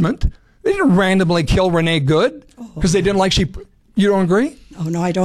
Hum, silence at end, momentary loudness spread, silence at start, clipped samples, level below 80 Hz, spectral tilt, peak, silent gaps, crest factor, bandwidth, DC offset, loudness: none; 0 s; 10 LU; 0 s; under 0.1%; -30 dBFS; -6 dB/octave; -6 dBFS; none; 10 dB; 13 kHz; under 0.1%; -17 LUFS